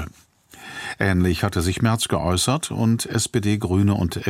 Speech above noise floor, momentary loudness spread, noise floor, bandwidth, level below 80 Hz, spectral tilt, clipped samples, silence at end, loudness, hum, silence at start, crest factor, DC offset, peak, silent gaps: 30 dB; 12 LU; -50 dBFS; 16 kHz; -42 dBFS; -5 dB/octave; under 0.1%; 0 s; -21 LUFS; none; 0 s; 16 dB; under 0.1%; -4 dBFS; none